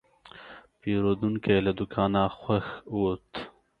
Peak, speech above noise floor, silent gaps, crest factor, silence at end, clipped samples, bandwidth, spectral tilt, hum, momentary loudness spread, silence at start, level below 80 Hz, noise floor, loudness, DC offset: -10 dBFS; 23 dB; none; 18 dB; 0.3 s; under 0.1%; 5 kHz; -9 dB/octave; none; 21 LU; 0.35 s; -52 dBFS; -50 dBFS; -28 LUFS; under 0.1%